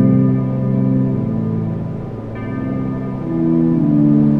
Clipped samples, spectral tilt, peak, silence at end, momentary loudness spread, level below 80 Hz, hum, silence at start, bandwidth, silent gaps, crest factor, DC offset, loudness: under 0.1%; -12 dB/octave; -2 dBFS; 0 s; 12 LU; -40 dBFS; none; 0 s; 3.7 kHz; none; 14 dB; under 0.1%; -17 LUFS